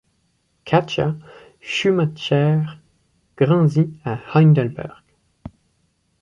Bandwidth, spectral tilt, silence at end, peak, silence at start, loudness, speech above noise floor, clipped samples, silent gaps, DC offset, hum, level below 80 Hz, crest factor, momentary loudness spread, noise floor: 7.4 kHz; -7.5 dB/octave; 0.75 s; -4 dBFS; 0.65 s; -19 LUFS; 48 dB; under 0.1%; none; under 0.1%; none; -56 dBFS; 18 dB; 15 LU; -66 dBFS